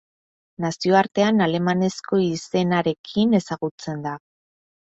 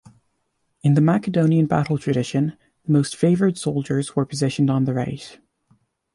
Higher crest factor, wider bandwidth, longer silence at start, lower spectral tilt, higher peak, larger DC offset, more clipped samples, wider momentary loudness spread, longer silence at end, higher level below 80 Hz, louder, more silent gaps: about the same, 18 dB vs 16 dB; second, 8 kHz vs 11.5 kHz; second, 0.6 s vs 0.85 s; about the same, -6 dB/octave vs -7 dB/octave; about the same, -4 dBFS vs -6 dBFS; neither; neither; about the same, 11 LU vs 9 LU; second, 0.65 s vs 0.8 s; second, -62 dBFS vs -56 dBFS; about the same, -22 LUFS vs -21 LUFS; first, 2.99-3.04 s, 3.71-3.78 s vs none